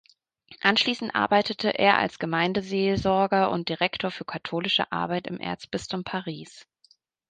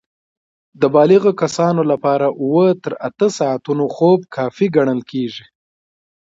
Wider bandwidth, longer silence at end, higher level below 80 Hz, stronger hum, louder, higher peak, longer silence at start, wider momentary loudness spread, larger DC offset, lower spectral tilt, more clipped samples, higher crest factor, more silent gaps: first, 9.6 kHz vs 8 kHz; second, 0.65 s vs 1 s; first, -58 dBFS vs -64 dBFS; neither; second, -25 LUFS vs -16 LUFS; second, -4 dBFS vs 0 dBFS; second, 0.5 s vs 0.8 s; about the same, 11 LU vs 11 LU; neither; second, -5 dB/octave vs -6.5 dB/octave; neither; first, 22 dB vs 16 dB; neither